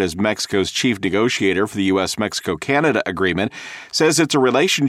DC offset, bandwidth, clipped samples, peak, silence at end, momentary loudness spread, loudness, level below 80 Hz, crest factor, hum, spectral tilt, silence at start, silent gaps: under 0.1%; 15.5 kHz; under 0.1%; -4 dBFS; 0 s; 7 LU; -18 LUFS; -52 dBFS; 16 dB; none; -4 dB/octave; 0 s; none